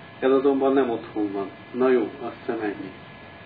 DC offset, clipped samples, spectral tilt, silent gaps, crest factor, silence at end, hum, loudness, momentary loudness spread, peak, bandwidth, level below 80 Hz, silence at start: under 0.1%; under 0.1%; -10 dB/octave; none; 16 dB; 0 s; none; -24 LUFS; 16 LU; -8 dBFS; 4.9 kHz; -64 dBFS; 0 s